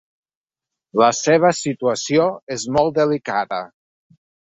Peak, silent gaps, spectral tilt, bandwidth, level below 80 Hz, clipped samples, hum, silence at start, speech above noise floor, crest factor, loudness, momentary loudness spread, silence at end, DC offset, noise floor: -2 dBFS; 2.43-2.47 s; -4.5 dB/octave; 8.2 kHz; -58 dBFS; under 0.1%; none; 0.95 s; 68 dB; 18 dB; -19 LUFS; 11 LU; 0.95 s; under 0.1%; -86 dBFS